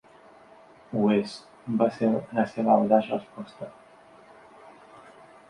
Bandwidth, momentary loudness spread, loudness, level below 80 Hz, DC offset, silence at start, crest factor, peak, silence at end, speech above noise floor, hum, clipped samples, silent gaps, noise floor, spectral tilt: 10.5 kHz; 19 LU; -25 LUFS; -68 dBFS; under 0.1%; 0.9 s; 22 dB; -6 dBFS; 1.8 s; 28 dB; none; under 0.1%; none; -53 dBFS; -7.5 dB/octave